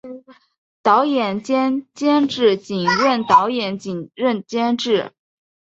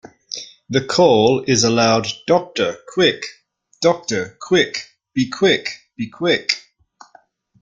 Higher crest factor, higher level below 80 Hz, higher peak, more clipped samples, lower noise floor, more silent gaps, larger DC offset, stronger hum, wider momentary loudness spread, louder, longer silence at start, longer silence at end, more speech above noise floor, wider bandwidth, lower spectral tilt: about the same, 18 dB vs 18 dB; second, -64 dBFS vs -56 dBFS; about the same, -2 dBFS vs 0 dBFS; neither; second, -39 dBFS vs -52 dBFS; first, 0.58-0.84 s vs none; neither; neither; second, 9 LU vs 15 LU; about the same, -18 LUFS vs -17 LUFS; second, 0.05 s vs 0.3 s; second, 0.5 s vs 1 s; second, 21 dB vs 35 dB; second, 8 kHz vs 9.4 kHz; about the same, -5 dB/octave vs -4 dB/octave